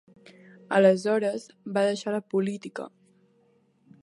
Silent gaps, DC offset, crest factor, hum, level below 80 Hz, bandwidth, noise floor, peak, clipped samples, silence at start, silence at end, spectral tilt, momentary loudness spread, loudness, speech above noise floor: none; under 0.1%; 20 dB; none; -80 dBFS; 11.5 kHz; -65 dBFS; -8 dBFS; under 0.1%; 0.7 s; 1.15 s; -6 dB/octave; 17 LU; -26 LUFS; 40 dB